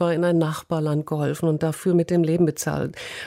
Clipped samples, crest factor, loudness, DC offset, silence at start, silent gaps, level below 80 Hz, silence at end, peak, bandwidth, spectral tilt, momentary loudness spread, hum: under 0.1%; 14 dB; -23 LUFS; under 0.1%; 0 s; none; -56 dBFS; 0 s; -8 dBFS; 16 kHz; -6.5 dB/octave; 6 LU; none